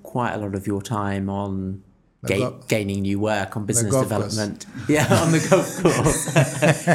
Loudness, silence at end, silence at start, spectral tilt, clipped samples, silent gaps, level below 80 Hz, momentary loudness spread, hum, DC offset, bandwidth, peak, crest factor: -22 LUFS; 0 s; 0.05 s; -5 dB/octave; under 0.1%; none; -48 dBFS; 10 LU; none; under 0.1%; 16.5 kHz; -2 dBFS; 20 dB